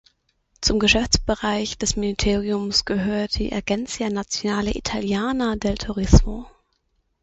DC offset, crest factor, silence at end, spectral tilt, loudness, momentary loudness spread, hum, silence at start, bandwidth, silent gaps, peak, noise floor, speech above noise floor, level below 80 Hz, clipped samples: under 0.1%; 22 dB; 0.75 s; -4 dB/octave; -22 LUFS; 8 LU; none; 0.6 s; 8.2 kHz; none; 0 dBFS; -69 dBFS; 48 dB; -28 dBFS; under 0.1%